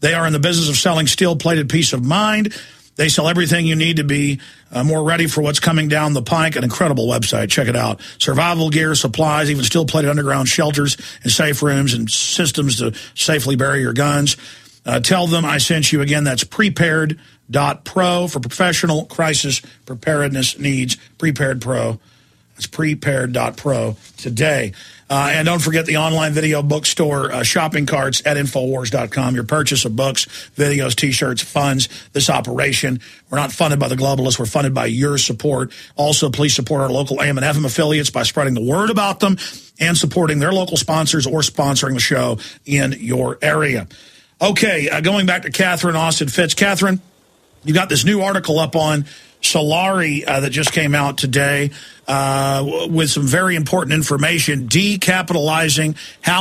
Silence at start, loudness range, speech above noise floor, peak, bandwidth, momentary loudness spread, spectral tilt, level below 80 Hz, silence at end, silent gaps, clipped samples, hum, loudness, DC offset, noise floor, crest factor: 0 s; 2 LU; 36 dB; 0 dBFS; 15 kHz; 6 LU; -4 dB/octave; -48 dBFS; 0 s; none; under 0.1%; none; -16 LUFS; under 0.1%; -53 dBFS; 16 dB